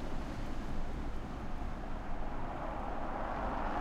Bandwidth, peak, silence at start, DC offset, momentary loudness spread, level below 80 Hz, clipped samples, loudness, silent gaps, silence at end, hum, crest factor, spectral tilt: 8.2 kHz; -24 dBFS; 0 s; under 0.1%; 6 LU; -40 dBFS; under 0.1%; -42 LUFS; none; 0 s; none; 12 dB; -7 dB/octave